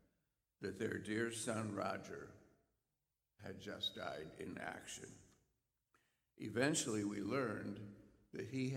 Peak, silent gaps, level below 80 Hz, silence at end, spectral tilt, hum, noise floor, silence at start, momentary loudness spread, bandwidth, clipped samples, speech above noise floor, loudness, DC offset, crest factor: -22 dBFS; none; -78 dBFS; 0 s; -4 dB/octave; none; under -90 dBFS; 0.6 s; 16 LU; 16.5 kHz; under 0.1%; over 47 dB; -44 LUFS; under 0.1%; 24 dB